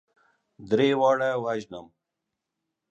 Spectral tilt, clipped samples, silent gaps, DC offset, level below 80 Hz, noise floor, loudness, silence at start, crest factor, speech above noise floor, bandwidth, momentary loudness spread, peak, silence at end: -6 dB/octave; under 0.1%; none; under 0.1%; -70 dBFS; -84 dBFS; -24 LUFS; 0.6 s; 18 dB; 60 dB; 8.2 kHz; 18 LU; -10 dBFS; 1.05 s